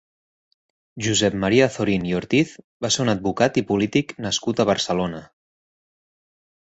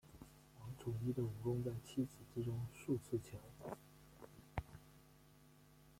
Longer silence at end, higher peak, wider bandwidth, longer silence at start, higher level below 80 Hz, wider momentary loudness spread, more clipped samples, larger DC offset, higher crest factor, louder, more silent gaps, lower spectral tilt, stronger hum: first, 1.4 s vs 0 s; first, -2 dBFS vs -26 dBFS; second, 8.2 kHz vs 16.5 kHz; first, 0.95 s vs 0.05 s; first, -52 dBFS vs -66 dBFS; second, 8 LU vs 24 LU; neither; neither; about the same, 20 dB vs 20 dB; first, -21 LUFS vs -46 LUFS; first, 2.64-2.80 s vs none; second, -4.5 dB/octave vs -7.5 dB/octave; neither